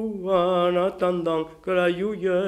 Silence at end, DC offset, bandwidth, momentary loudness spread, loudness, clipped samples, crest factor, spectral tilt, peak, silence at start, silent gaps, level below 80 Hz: 0 s; under 0.1%; 12 kHz; 5 LU; -23 LUFS; under 0.1%; 14 dB; -7 dB/octave; -8 dBFS; 0 s; none; -56 dBFS